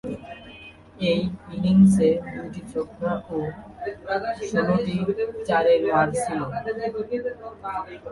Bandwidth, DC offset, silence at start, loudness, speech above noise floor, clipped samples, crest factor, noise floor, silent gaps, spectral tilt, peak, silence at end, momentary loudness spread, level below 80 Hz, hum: 11.5 kHz; under 0.1%; 0.05 s; -24 LUFS; 22 dB; under 0.1%; 18 dB; -45 dBFS; none; -7 dB/octave; -6 dBFS; 0 s; 16 LU; -52 dBFS; none